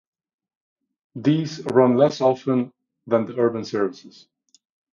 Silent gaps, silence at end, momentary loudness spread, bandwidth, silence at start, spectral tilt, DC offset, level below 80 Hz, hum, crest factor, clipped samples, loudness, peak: none; 0.85 s; 8 LU; 7.4 kHz; 1.15 s; -7 dB/octave; under 0.1%; -68 dBFS; none; 20 dB; under 0.1%; -21 LUFS; -2 dBFS